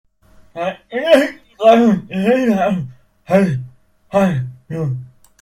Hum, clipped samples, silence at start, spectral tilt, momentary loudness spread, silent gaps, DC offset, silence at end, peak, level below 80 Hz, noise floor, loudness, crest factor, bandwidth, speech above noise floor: none; under 0.1%; 0.55 s; -7 dB/octave; 14 LU; none; under 0.1%; 0.35 s; 0 dBFS; -52 dBFS; -48 dBFS; -16 LUFS; 16 dB; 15.5 kHz; 34 dB